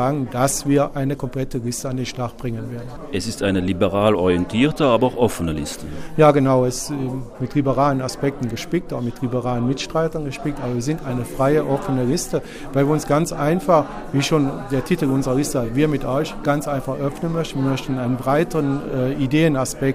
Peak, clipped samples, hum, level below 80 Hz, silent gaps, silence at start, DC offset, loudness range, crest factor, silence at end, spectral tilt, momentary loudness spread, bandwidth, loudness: -2 dBFS; under 0.1%; none; -38 dBFS; none; 0 s; under 0.1%; 4 LU; 18 dB; 0 s; -6 dB/octave; 9 LU; 15.5 kHz; -21 LUFS